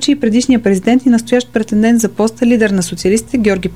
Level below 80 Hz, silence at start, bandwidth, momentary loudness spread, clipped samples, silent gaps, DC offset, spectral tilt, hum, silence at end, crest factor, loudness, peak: -40 dBFS; 0 s; 14.5 kHz; 4 LU; under 0.1%; none; 0.7%; -5 dB/octave; none; 0 s; 12 dB; -12 LUFS; 0 dBFS